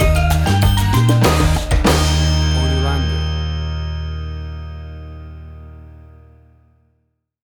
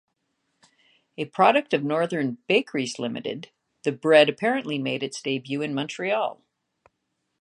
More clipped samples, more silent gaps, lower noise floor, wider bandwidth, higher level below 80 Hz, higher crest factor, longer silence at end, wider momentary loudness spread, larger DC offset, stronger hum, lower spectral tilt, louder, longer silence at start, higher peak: neither; neither; second, -66 dBFS vs -77 dBFS; first, 18.5 kHz vs 10.5 kHz; first, -22 dBFS vs -78 dBFS; second, 14 dB vs 22 dB; first, 1.55 s vs 1.05 s; first, 20 LU vs 14 LU; neither; neither; about the same, -5.5 dB/octave vs -5 dB/octave; first, -16 LUFS vs -24 LUFS; second, 0 s vs 1.2 s; about the same, -4 dBFS vs -2 dBFS